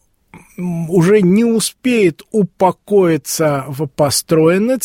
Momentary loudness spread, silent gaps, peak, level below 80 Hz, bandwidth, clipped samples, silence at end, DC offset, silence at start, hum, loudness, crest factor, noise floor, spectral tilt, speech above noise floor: 9 LU; none; 0 dBFS; -52 dBFS; 16.5 kHz; under 0.1%; 0 s; under 0.1%; 0.35 s; none; -14 LUFS; 14 dB; -44 dBFS; -5.5 dB/octave; 30 dB